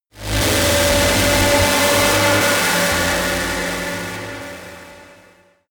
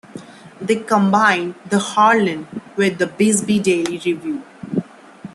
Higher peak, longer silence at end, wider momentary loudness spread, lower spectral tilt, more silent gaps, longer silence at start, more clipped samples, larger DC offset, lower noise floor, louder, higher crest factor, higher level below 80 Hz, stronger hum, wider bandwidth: second, -4 dBFS vs 0 dBFS; first, 0.65 s vs 0.05 s; about the same, 15 LU vs 15 LU; second, -3 dB/octave vs -4.5 dB/octave; neither; about the same, 0.15 s vs 0.15 s; neither; neither; first, -51 dBFS vs -38 dBFS; about the same, -15 LUFS vs -17 LUFS; about the same, 14 dB vs 18 dB; first, -34 dBFS vs -62 dBFS; neither; first, over 20 kHz vs 12.5 kHz